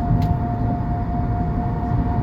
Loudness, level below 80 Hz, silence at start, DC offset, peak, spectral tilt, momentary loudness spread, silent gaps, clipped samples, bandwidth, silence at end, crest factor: -22 LUFS; -26 dBFS; 0 s; under 0.1%; -6 dBFS; -10.5 dB/octave; 3 LU; none; under 0.1%; 5.6 kHz; 0 s; 14 dB